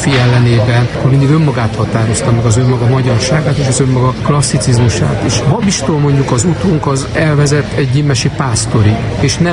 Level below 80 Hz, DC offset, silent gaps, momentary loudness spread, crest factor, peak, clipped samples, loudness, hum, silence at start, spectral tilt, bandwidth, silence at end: -30 dBFS; 0.3%; none; 4 LU; 10 dB; 0 dBFS; under 0.1%; -11 LUFS; none; 0 s; -5.5 dB/octave; 11.5 kHz; 0 s